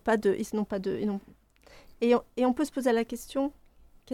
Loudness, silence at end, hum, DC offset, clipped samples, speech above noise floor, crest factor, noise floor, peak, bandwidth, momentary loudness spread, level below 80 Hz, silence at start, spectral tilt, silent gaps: -29 LUFS; 0 s; none; under 0.1%; under 0.1%; 28 dB; 18 dB; -56 dBFS; -10 dBFS; 16 kHz; 7 LU; -58 dBFS; 0.05 s; -5.5 dB/octave; none